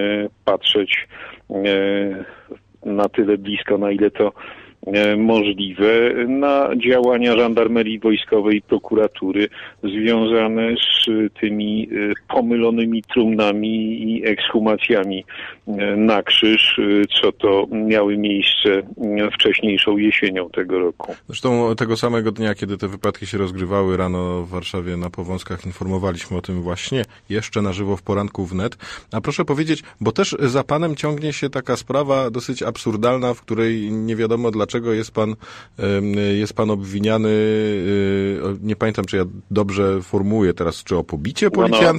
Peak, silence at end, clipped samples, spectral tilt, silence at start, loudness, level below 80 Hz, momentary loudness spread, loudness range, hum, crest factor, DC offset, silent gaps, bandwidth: -4 dBFS; 0 s; under 0.1%; -5.5 dB/octave; 0 s; -19 LUFS; -50 dBFS; 10 LU; 7 LU; none; 16 dB; under 0.1%; none; 13 kHz